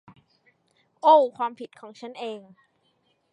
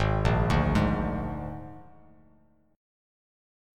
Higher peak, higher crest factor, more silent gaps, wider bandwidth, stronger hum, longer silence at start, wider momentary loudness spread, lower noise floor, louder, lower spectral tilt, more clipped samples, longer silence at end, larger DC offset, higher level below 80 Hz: first, -6 dBFS vs -10 dBFS; about the same, 20 dB vs 20 dB; neither; second, 9.4 kHz vs 12 kHz; neither; first, 1.05 s vs 0 s; first, 24 LU vs 16 LU; first, -69 dBFS vs -63 dBFS; first, -23 LUFS vs -27 LUFS; second, -5 dB/octave vs -7.5 dB/octave; neither; second, 0.95 s vs 1.9 s; neither; second, -82 dBFS vs -36 dBFS